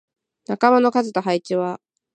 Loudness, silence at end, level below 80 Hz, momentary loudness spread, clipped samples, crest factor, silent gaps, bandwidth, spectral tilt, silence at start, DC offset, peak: -19 LUFS; 0.4 s; -74 dBFS; 14 LU; under 0.1%; 20 dB; none; 9 kHz; -6 dB/octave; 0.5 s; under 0.1%; -2 dBFS